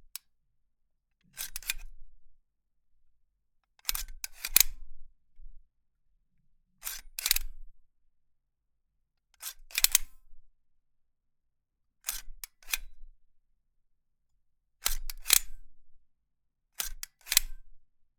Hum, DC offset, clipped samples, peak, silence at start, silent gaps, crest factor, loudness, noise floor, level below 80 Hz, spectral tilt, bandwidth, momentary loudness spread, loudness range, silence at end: none; under 0.1%; under 0.1%; -4 dBFS; 1.35 s; none; 34 dB; -29 LUFS; -78 dBFS; -46 dBFS; 2 dB/octave; 19.5 kHz; 21 LU; 11 LU; 0.35 s